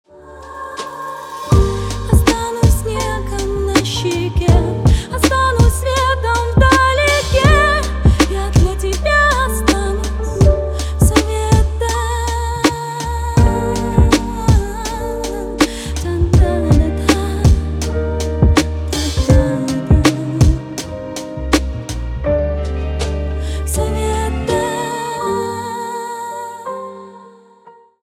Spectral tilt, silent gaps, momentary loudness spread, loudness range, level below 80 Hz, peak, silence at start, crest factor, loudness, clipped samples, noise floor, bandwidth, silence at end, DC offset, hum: -5.5 dB/octave; none; 12 LU; 7 LU; -20 dBFS; 0 dBFS; 0.15 s; 14 dB; -16 LUFS; under 0.1%; -45 dBFS; 15.5 kHz; 0.35 s; under 0.1%; none